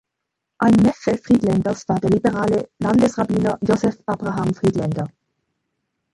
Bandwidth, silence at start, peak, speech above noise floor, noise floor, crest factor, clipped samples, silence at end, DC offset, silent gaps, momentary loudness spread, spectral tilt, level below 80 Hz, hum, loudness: 11.5 kHz; 0.6 s; -4 dBFS; 62 dB; -80 dBFS; 16 dB; under 0.1%; 1.05 s; under 0.1%; none; 8 LU; -7.5 dB/octave; -48 dBFS; none; -19 LUFS